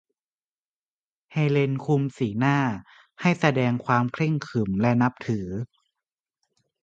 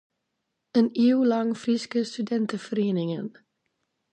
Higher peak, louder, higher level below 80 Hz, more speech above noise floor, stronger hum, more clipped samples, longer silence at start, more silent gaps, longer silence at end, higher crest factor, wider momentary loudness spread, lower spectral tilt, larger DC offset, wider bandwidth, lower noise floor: first, -4 dBFS vs -8 dBFS; about the same, -24 LUFS vs -25 LUFS; first, -58 dBFS vs -78 dBFS; first, over 66 dB vs 56 dB; neither; neither; first, 1.3 s vs 0.75 s; neither; first, 1.2 s vs 0.85 s; about the same, 22 dB vs 18 dB; about the same, 9 LU vs 8 LU; about the same, -7.5 dB/octave vs -6.5 dB/octave; neither; second, 7.8 kHz vs 9 kHz; first, under -90 dBFS vs -80 dBFS